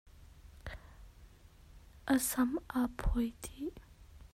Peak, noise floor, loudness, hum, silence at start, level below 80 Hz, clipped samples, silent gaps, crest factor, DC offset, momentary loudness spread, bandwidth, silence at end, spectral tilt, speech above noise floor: -18 dBFS; -58 dBFS; -35 LUFS; none; 0.05 s; -46 dBFS; under 0.1%; none; 20 dB; under 0.1%; 19 LU; 16 kHz; 0.05 s; -4.5 dB/octave; 24 dB